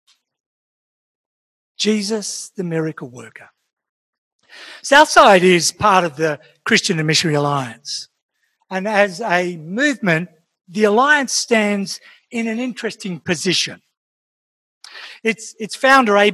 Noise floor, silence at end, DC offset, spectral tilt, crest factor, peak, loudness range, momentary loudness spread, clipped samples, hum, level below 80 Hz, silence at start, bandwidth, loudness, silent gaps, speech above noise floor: under -90 dBFS; 0 s; under 0.1%; -3.5 dB/octave; 18 dB; 0 dBFS; 11 LU; 16 LU; 0.1%; none; -58 dBFS; 1.8 s; 16 kHz; -16 LUFS; 3.73-3.77 s, 3.89-4.39 s, 8.22-8.29 s, 13.97-14.81 s; over 73 dB